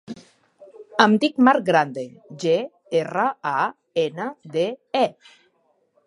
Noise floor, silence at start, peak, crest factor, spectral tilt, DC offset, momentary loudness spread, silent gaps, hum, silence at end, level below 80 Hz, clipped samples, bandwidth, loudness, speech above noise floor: -66 dBFS; 0.1 s; 0 dBFS; 22 dB; -5.5 dB/octave; under 0.1%; 13 LU; none; none; 0.95 s; -74 dBFS; under 0.1%; 11 kHz; -21 LUFS; 45 dB